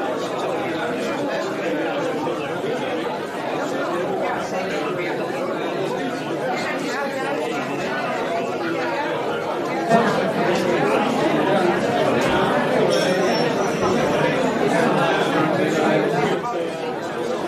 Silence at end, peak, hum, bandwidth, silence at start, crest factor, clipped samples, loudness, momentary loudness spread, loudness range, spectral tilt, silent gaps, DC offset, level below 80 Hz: 0 s; -4 dBFS; none; 14.5 kHz; 0 s; 18 dB; under 0.1%; -21 LUFS; 6 LU; 5 LU; -5 dB/octave; none; under 0.1%; -58 dBFS